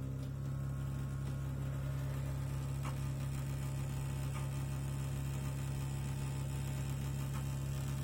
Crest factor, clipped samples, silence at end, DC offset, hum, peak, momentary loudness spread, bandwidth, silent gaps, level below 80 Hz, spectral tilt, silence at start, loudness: 10 dB; under 0.1%; 0 s; under 0.1%; none; -28 dBFS; 1 LU; 17 kHz; none; -48 dBFS; -6.5 dB/octave; 0 s; -40 LUFS